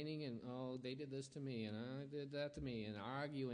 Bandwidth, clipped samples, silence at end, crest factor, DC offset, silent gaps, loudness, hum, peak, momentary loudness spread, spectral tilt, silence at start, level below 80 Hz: 10 kHz; under 0.1%; 0 s; 14 dB; under 0.1%; none; -48 LUFS; none; -34 dBFS; 3 LU; -6.5 dB/octave; 0 s; -72 dBFS